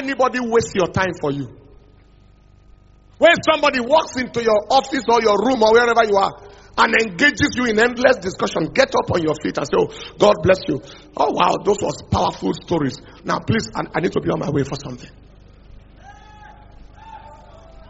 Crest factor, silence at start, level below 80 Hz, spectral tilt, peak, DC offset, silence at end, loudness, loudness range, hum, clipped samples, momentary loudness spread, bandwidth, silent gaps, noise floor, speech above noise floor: 20 dB; 0 s; -46 dBFS; -3.5 dB/octave; 0 dBFS; under 0.1%; 0.35 s; -18 LUFS; 8 LU; 50 Hz at -50 dBFS; under 0.1%; 10 LU; 8 kHz; none; -49 dBFS; 31 dB